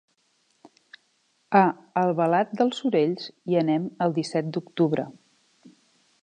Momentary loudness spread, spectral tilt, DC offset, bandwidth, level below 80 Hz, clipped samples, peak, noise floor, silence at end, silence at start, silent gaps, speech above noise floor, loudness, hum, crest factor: 8 LU; -7 dB/octave; under 0.1%; 9.6 kHz; -76 dBFS; under 0.1%; -6 dBFS; -69 dBFS; 1.1 s; 1.5 s; none; 45 dB; -24 LUFS; none; 20 dB